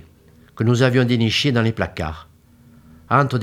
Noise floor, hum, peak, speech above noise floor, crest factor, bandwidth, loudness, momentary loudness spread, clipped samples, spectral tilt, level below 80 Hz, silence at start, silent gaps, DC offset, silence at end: -50 dBFS; none; 0 dBFS; 32 dB; 20 dB; 13.5 kHz; -19 LUFS; 12 LU; under 0.1%; -6 dB/octave; -48 dBFS; 0.55 s; none; under 0.1%; 0 s